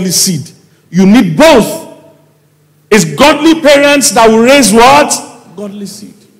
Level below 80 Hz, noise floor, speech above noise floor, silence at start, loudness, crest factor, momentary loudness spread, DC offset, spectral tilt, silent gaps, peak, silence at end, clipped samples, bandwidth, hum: -38 dBFS; -48 dBFS; 42 dB; 0 s; -6 LUFS; 8 dB; 19 LU; under 0.1%; -3.5 dB/octave; none; 0 dBFS; 0.35 s; 1%; 16.5 kHz; none